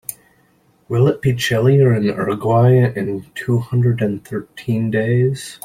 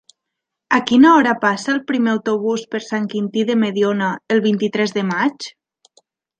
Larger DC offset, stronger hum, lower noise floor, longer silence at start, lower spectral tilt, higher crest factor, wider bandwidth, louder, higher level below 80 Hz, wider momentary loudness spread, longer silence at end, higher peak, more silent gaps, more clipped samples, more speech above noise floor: neither; neither; second, -57 dBFS vs -80 dBFS; second, 0.1 s vs 0.7 s; first, -7 dB/octave vs -5.5 dB/octave; about the same, 14 dB vs 16 dB; first, 15.5 kHz vs 9.2 kHz; about the same, -17 LUFS vs -17 LUFS; first, -52 dBFS vs -64 dBFS; about the same, 12 LU vs 11 LU; second, 0.1 s vs 0.9 s; about the same, -2 dBFS vs -2 dBFS; neither; neither; second, 41 dB vs 64 dB